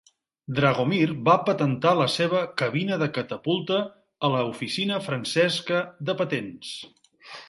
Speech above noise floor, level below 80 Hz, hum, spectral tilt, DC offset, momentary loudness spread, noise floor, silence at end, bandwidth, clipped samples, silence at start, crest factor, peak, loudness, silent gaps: 21 dB; -66 dBFS; none; -5.5 dB/octave; under 0.1%; 10 LU; -46 dBFS; 0.05 s; 11.5 kHz; under 0.1%; 0.5 s; 20 dB; -4 dBFS; -24 LUFS; none